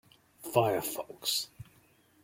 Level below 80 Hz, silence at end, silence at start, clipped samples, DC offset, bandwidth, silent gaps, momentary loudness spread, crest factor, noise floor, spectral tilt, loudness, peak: -68 dBFS; 0.6 s; 0.4 s; under 0.1%; under 0.1%; 16.5 kHz; none; 13 LU; 22 dB; -65 dBFS; -3.5 dB/octave; -31 LUFS; -12 dBFS